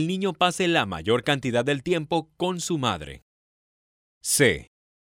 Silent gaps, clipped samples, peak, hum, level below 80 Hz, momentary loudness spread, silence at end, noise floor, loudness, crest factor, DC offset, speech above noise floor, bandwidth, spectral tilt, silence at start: 3.22-4.21 s; under 0.1%; -6 dBFS; none; -54 dBFS; 10 LU; 0.35 s; under -90 dBFS; -24 LUFS; 20 dB; under 0.1%; over 66 dB; 16 kHz; -4 dB/octave; 0 s